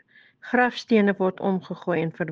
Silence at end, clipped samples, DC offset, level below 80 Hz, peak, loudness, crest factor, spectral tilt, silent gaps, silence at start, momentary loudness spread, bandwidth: 0 s; under 0.1%; under 0.1%; -68 dBFS; -6 dBFS; -24 LUFS; 18 dB; -7 dB/octave; none; 0.45 s; 7 LU; 7.4 kHz